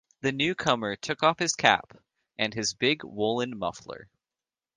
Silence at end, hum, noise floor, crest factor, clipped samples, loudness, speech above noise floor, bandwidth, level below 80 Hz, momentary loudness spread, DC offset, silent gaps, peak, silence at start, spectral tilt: 0.7 s; none; under -90 dBFS; 26 dB; under 0.1%; -27 LUFS; over 63 dB; 10.5 kHz; -64 dBFS; 14 LU; under 0.1%; none; -2 dBFS; 0.25 s; -3 dB/octave